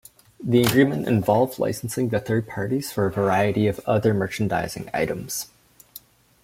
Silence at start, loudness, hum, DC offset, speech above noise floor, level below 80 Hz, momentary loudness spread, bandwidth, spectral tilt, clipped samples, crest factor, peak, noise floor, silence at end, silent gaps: 0.4 s; -23 LUFS; none; under 0.1%; 26 dB; -54 dBFS; 11 LU; 16.5 kHz; -6 dB/octave; under 0.1%; 18 dB; -4 dBFS; -48 dBFS; 0.45 s; none